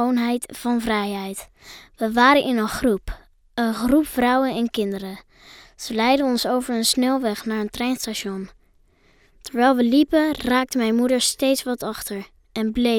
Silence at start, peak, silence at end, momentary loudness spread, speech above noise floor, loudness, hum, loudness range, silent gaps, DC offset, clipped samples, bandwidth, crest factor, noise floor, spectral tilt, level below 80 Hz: 0 s; -4 dBFS; 0 s; 16 LU; 37 dB; -21 LUFS; none; 3 LU; none; under 0.1%; under 0.1%; 18 kHz; 18 dB; -58 dBFS; -3.5 dB/octave; -46 dBFS